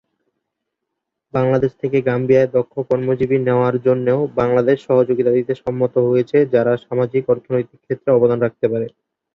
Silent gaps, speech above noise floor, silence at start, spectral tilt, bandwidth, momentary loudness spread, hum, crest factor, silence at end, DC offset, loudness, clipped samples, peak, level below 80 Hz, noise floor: none; 62 dB; 1.35 s; -9.5 dB/octave; 6.4 kHz; 6 LU; none; 16 dB; 0.45 s; under 0.1%; -17 LUFS; under 0.1%; -2 dBFS; -54 dBFS; -79 dBFS